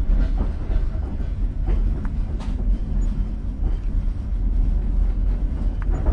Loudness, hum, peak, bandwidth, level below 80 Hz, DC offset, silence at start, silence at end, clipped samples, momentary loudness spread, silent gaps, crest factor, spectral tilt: -26 LUFS; none; -8 dBFS; 3.7 kHz; -22 dBFS; under 0.1%; 0 s; 0 s; under 0.1%; 4 LU; none; 12 dB; -9 dB/octave